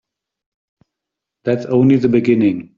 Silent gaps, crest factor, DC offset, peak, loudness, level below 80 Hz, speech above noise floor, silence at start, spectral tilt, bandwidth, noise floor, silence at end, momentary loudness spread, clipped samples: none; 14 dB; under 0.1%; -2 dBFS; -15 LUFS; -56 dBFS; 68 dB; 1.45 s; -8.5 dB/octave; 7.2 kHz; -82 dBFS; 0.15 s; 8 LU; under 0.1%